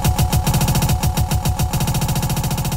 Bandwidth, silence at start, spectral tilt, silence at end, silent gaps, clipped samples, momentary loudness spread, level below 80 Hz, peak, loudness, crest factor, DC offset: 16.5 kHz; 0 s; -5 dB/octave; 0 s; none; under 0.1%; 3 LU; -24 dBFS; -6 dBFS; -19 LUFS; 12 dB; 0.9%